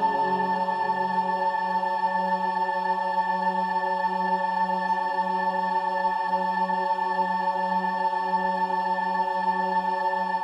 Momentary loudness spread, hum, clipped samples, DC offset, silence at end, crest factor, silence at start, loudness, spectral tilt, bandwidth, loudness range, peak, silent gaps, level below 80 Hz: 1 LU; none; under 0.1%; under 0.1%; 0 s; 12 dB; 0 s; -25 LUFS; -6 dB/octave; 10 kHz; 0 LU; -14 dBFS; none; -74 dBFS